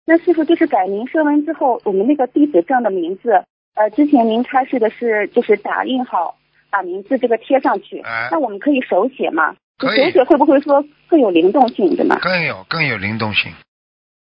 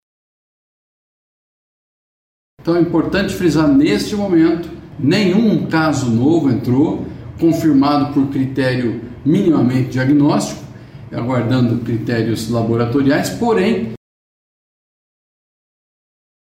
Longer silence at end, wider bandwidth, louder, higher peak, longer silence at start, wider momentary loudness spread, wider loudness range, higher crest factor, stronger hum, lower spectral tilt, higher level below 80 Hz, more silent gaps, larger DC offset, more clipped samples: second, 0.7 s vs 2.55 s; second, 5.4 kHz vs 16 kHz; about the same, -16 LUFS vs -15 LUFS; first, 0 dBFS vs -4 dBFS; second, 0.1 s vs 2.65 s; about the same, 8 LU vs 9 LU; about the same, 4 LU vs 5 LU; about the same, 16 dB vs 14 dB; neither; first, -8.5 dB/octave vs -6.5 dB/octave; second, -58 dBFS vs -44 dBFS; first, 3.50-3.72 s, 9.63-9.75 s vs none; neither; neither